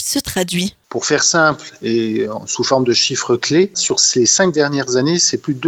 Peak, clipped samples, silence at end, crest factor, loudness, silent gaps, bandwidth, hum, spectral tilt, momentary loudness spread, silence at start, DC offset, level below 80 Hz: 0 dBFS; under 0.1%; 0 s; 16 dB; -15 LUFS; none; 18.5 kHz; none; -3 dB/octave; 9 LU; 0 s; under 0.1%; -50 dBFS